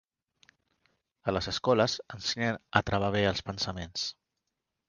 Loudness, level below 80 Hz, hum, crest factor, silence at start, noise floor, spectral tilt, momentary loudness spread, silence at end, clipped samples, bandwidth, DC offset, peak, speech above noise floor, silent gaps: -30 LUFS; -54 dBFS; none; 28 dB; 1.25 s; -85 dBFS; -4.5 dB/octave; 8 LU; 0.75 s; under 0.1%; 10 kHz; under 0.1%; -4 dBFS; 55 dB; none